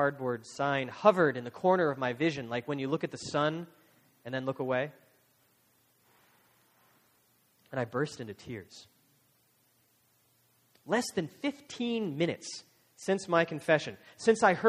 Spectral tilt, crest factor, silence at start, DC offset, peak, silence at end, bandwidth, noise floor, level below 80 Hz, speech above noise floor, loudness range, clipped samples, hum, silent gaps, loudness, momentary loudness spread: -5 dB/octave; 24 dB; 0 s; under 0.1%; -8 dBFS; 0 s; 15.5 kHz; -70 dBFS; -74 dBFS; 39 dB; 11 LU; under 0.1%; none; none; -31 LUFS; 16 LU